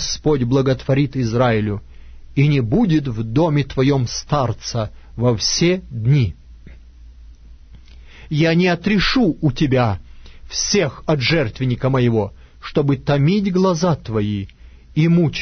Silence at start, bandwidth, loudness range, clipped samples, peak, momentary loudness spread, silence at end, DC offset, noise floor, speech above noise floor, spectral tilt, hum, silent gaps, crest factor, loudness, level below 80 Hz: 0 s; 6.6 kHz; 3 LU; under 0.1%; -4 dBFS; 9 LU; 0 s; under 0.1%; -41 dBFS; 24 dB; -5.5 dB/octave; none; none; 14 dB; -18 LUFS; -38 dBFS